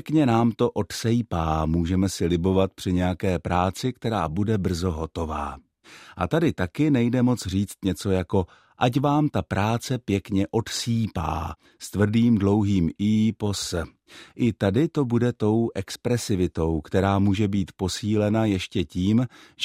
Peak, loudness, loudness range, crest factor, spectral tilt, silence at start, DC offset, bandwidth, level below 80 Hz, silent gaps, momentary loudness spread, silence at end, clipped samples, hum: -6 dBFS; -24 LUFS; 2 LU; 18 dB; -6.5 dB/octave; 0.05 s; under 0.1%; 15.5 kHz; -46 dBFS; none; 8 LU; 0 s; under 0.1%; none